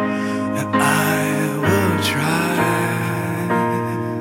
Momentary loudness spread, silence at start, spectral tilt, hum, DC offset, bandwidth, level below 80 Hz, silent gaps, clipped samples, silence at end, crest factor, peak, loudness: 5 LU; 0 s; -5 dB/octave; none; under 0.1%; 16.5 kHz; -56 dBFS; none; under 0.1%; 0 s; 16 dB; -4 dBFS; -19 LUFS